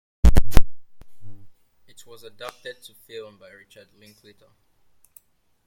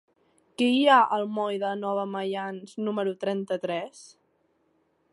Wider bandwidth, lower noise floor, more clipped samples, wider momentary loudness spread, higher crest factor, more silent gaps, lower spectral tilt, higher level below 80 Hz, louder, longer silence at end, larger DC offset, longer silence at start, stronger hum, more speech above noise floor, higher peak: first, 14.5 kHz vs 11.5 kHz; second, -62 dBFS vs -70 dBFS; first, 0.3% vs under 0.1%; first, 30 LU vs 14 LU; about the same, 20 dB vs 20 dB; neither; about the same, -6 dB/octave vs -5 dB/octave; first, -26 dBFS vs -80 dBFS; about the same, -26 LUFS vs -26 LUFS; first, 2.45 s vs 1.05 s; neither; second, 0.25 s vs 0.6 s; neither; second, 19 dB vs 44 dB; first, 0 dBFS vs -8 dBFS